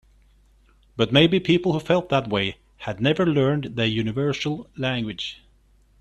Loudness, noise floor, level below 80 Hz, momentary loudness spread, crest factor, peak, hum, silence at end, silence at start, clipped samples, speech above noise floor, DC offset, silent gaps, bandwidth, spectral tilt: -22 LUFS; -58 dBFS; -52 dBFS; 13 LU; 22 dB; -2 dBFS; none; 0.65 s; 0.95 s; under 0.1%; 36 dB; under 0.1%; none; 11.5 kHz; -6.5 dB/octave